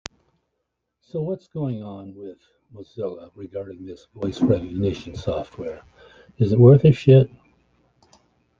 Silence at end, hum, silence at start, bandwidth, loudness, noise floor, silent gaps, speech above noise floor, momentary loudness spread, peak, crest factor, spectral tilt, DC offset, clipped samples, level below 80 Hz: 1.3 s; none; 1.15 s; 7.4 kHz; -20 LUFS; -78 dBFS; none; 57 dB; 25 LU; -2 dBFS; 20 dB; -9 dB/octave; under 0.1%; under 0.1%; -50 dBFS